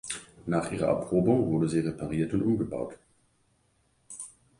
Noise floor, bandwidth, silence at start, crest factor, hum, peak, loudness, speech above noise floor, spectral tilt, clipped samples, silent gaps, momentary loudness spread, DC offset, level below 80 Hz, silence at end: -69 dBFS; 11.5 kHz; 0.05 s; 20 dB; none; -10 dBFS; -28 LUFS; 42 dB; -6.5 dB/octave; under 0.1%; none; 17 LU; under 0.1%; -56 dBFS; 0.3 s